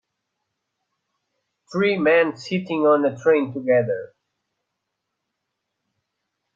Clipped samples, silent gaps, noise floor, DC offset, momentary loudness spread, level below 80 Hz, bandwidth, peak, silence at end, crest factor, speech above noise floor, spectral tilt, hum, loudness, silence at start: under 0.1%; none; -80 dBFS; under 0.1%; 10 LU; -70 dBFS; 7.4 kHz; -6 dBFS; 2.5 s; 18 dB; 60 dB; -7 dB/octave; none; -20 LUFS; 1.7 s